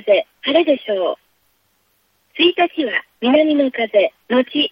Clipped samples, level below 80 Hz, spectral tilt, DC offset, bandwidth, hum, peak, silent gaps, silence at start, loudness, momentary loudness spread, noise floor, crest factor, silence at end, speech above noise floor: under 0.1%; -68 dBFS; -6 dB/octave; under 0.1%; 5.4 kHz; none; -2 dBFS; none; 0.05 s; -17 LUFS; 7 LU; -63 dBFS; 16 dB; 0 s; 47 dB